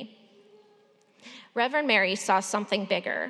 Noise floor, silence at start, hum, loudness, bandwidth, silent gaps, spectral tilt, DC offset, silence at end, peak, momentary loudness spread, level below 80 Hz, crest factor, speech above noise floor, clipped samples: -62 dBFS; 0 s; none; -26 LUFS; 13.5 kHz; none; -3 dB/octave; under 0.1%; 0 s; -8 dBFS; 24 LU; under -90 dBFS; 20 dB; 35 dB; under 0.1%